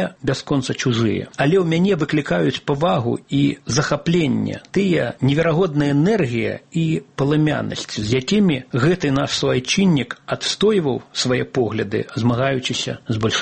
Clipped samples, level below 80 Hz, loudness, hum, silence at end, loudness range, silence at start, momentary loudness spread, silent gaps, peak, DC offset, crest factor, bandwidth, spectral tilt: under 0.1%; -48 dBFS; -19 LUFS; none; 0 s; 1 LU; 0 s; 6 LU; none; -2 dBFS; under 0.1%; 16 dB; 8.8 kHz; -5.5 dB/octave